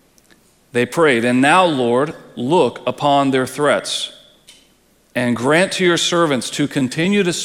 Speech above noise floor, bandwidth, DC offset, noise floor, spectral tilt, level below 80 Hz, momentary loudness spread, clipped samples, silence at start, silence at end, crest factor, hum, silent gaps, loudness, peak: 39 dB; 16 kHz; under 0.1%; -55 dBFS; -4.5 dB/octave; -60 dBFS; 9 LU; under 0.1%; 0.75 s; 0 s; 18 dB; none; none; -16 LUFS; 0 dBFS